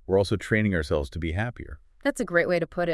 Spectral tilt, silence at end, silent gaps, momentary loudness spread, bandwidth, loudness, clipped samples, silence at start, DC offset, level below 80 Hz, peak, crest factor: -6.5 dB/octave; 0 s; none; 8 LU; 12 kHz; -26 LUFS; under 0.1%; 0.1 s; under 0.1%; -44 dBFS; -8 dBFS; 18 dB